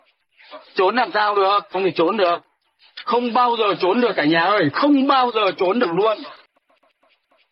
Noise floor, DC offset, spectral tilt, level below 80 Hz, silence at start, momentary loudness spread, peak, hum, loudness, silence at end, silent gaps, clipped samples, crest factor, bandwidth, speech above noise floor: -62 dBFS; under 0.1%; -8 dB/octave; -74 dBFS; 0.5 s; 6 LU; -6 dBFS; none; -18 LUFS; 1.15 s; none; under 0.1%; 14 dB; 5.8 kHz; 44 dB